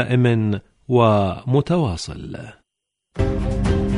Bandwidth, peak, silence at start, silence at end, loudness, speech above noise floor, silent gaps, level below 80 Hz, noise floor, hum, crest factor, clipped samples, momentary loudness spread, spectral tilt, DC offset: 11 kHz; -2 dBFS; 0 s; 0 s; -20 LUFS; 61 dB; none; -32 dBFS; -80 dBFS; none; 16 dB; under 0.1%; 17 LU; -7.5 dB/octave; under 0.1%